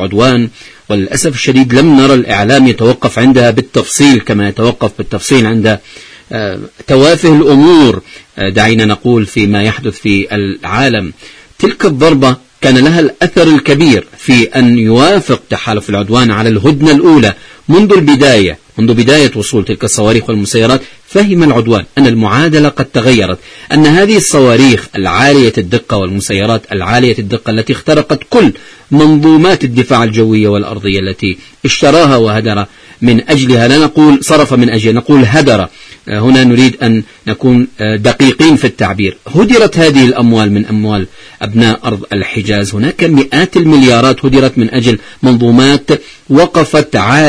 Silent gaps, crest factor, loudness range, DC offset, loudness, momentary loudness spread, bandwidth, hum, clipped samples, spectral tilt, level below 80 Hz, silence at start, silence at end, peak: none; 8 dB; 3 LU; under 0.1%; -8 LUFS; 9 LU; 11 kHz; none; 2%; -5.5 dB/octave; -36 dBFS; 0 s; 0 s; 0 dBFS